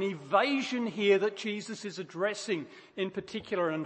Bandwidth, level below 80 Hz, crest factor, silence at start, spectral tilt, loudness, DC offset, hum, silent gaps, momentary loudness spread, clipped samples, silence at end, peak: 8.8 kHz; -76 dBFS; 20 dB; 0 s; -4.5 dB/octave; -31 LUFS; under 0.1%; none; none; 12 LU; under 0.1%; 0 s; -12 dBFS